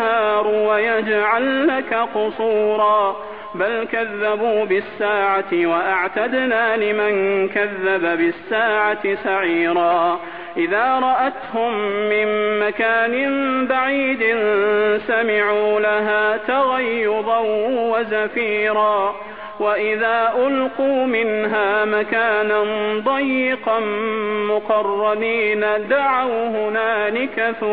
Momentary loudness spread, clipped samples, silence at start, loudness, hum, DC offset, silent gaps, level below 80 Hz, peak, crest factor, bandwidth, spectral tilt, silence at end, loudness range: 4 LU; under 0.1%; 0 s; -18 LUFS; none; 0.4%; none; -60 dBFS; -4 dBFS; 14 dB; 4.8 kHz; -8 dB/octave; 0 s; 2 LU